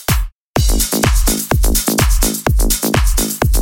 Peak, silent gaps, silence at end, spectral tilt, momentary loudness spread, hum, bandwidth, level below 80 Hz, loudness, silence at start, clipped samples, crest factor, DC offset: 0 dBFS; 0.32-0.54 s; 0 s; -4 dB/octave; 4 LU; none; 17 kHz; -16 dBFS; -15 LUFS; 0 s; under 0.1%; 12 dB; under 0.1%